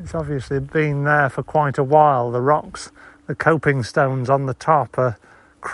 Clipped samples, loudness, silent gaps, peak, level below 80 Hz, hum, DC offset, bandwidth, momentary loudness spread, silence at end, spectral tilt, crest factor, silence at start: under 0.1%; -19 LUFS; none; -2 dBFS; -48 dBFS; none; under 0.1%; 11.5 kHz; 16 LU; 0 s; -7 dB/octave; 18 dB; 0 s